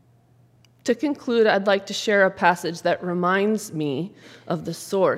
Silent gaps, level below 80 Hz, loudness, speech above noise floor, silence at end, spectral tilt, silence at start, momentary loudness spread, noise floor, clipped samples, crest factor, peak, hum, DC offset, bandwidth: none; -70 dBFS; -22 LUFS; 35 dB; 0 s; -5 dB/octave; 0.85 s; 11 LU; -57 dBFS; under 0.1%; 20 dB; -2 dBFS; none; under 0.1%; 16 kHz